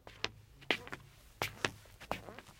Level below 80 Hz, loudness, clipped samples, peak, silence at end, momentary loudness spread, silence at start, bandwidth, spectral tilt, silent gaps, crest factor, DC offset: -62 dBFS; -40 LUFS; under 0.1%; -8 dBFS; 0 s; 17 LU; 0.05 s; 16.5 kHz; -3 dB/octave; none; 34 dB; under 0.1%